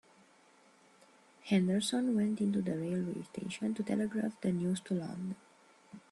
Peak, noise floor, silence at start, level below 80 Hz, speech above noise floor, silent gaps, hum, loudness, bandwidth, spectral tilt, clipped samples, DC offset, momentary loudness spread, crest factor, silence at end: -18 dBFS; -64 dBFS; 1.45 s; -74 dBFS; 31 dB; none; none; -35 LUFS; 12.5 kHz; -6 dB/octave; under 0.1%; under 0.1%; 10 LU; 16 dB; 0.1 s